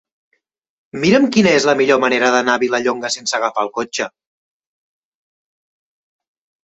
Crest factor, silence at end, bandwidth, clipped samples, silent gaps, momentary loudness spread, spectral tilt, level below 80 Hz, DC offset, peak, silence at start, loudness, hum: 16 dB; 2.55 s; 8.2 kHz; under 0.1%; none; 10 LU; -4 dB/octave; -58 dBFS; under 0.1%; -2 dBFS; 0.95 s; -15 LUFS; none